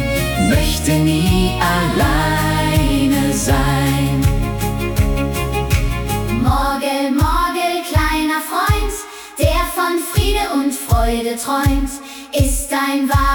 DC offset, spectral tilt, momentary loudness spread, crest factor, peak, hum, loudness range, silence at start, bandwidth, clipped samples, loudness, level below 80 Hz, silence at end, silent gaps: under 0.1%; -5 dB/octave; 5 LU; 14 dB; -2 dBFS; none; 2 LU; 0 s; 18 kHz; under 0.1%; -17 LUFS; -24 dBFS; 0 s; none